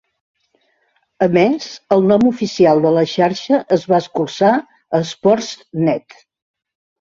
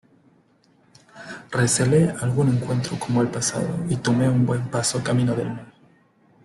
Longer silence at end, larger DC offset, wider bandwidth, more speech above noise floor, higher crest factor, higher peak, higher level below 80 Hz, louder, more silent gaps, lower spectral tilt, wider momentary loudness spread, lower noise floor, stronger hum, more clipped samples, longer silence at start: first, 1.05 s vs 0.8 s; neither; second, 7.6 kHz vs 12.5 kHz; first, 48 dB vs 38 dB; about the same, 16 dB vs 16 dB; first, 0 dBFS vs -6 dBFS; about the same, -58 dBFS vs -54 dBFS; first, -16 LUFS vs -22 LUFS; neither; about the same, -6 dB/octave vs -5.5 dB/octave; second, 8 LU vs 11 LU; first, -63 dBFS vs -59 dBFS; neither; neither; about the same, 1.2 s vs 1.15 s